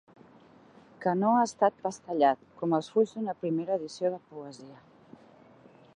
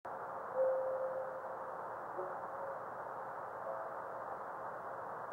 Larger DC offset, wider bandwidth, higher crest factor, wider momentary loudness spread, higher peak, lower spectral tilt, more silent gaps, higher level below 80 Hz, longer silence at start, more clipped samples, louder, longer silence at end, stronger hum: neither; second, 10.5 kHz vs 15.5 kHz; about the same, 20 dB vs 18 dB; first, 17 LU vs 9 LU; first, -10 dBFS vs -24 dBFS; about the same, -6 dB/octave vs -6.5 dB/octave; neither; about the same, -78 dBFS vs -82 dBFS; first, 1 s vs 0.05 s; neither; first, -29 LUFS vs -42 LUFS; first, 1.25 s vs 0 s; neither